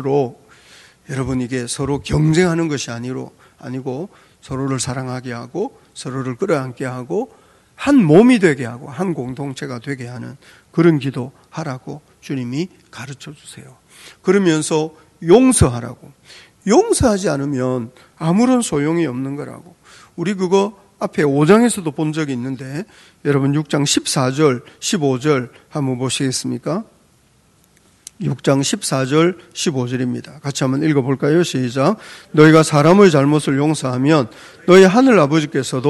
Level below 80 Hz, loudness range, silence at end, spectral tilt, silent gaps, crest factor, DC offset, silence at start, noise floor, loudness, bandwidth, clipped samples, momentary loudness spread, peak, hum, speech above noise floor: -44 dBFS; 9 LU; 0 s; -5.5 dB/octave; none; 18 dB; under 0.1%; 0 s; -55 dBFS; -17 LUFS; 12.5 kHz; 0.1%; 17 LU; 0 dBFS; none; 38 dB